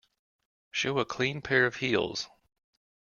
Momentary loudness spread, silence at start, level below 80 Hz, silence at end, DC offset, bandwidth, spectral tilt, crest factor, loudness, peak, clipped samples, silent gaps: 10 LU; 0.75 s; -64 dBFS; 0.8 s; under 0.1%; 7.2 kHz; -4 dB/octave; 22 dB; -29 LUFS; -10 dBFS; under 0.1%; none